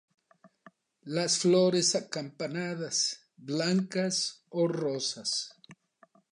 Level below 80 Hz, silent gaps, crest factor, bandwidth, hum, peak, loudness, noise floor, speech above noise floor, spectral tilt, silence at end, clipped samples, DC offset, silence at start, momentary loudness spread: -82 dBFS; none; 18 dB; 11 kHz; none; -14 dBFS; -29 LUFS; -64 dBFS; 35 dB; -3.5 dB/octave; 0.6 s; under 0.1%; under 0.1%; 0.45 s; 12 LU